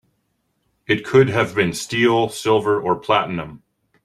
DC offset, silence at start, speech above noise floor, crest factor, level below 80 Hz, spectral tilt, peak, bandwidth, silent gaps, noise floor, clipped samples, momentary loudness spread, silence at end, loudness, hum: under 0.1%; 0.9 s; 51 dB; 18 dB; -54 dBFS; -5 dB/octave; -2 dBFS; 14 kHz; none; -70 dBFS; under 0.1%; 8 LU; 0.5 s; -18 LUFS; none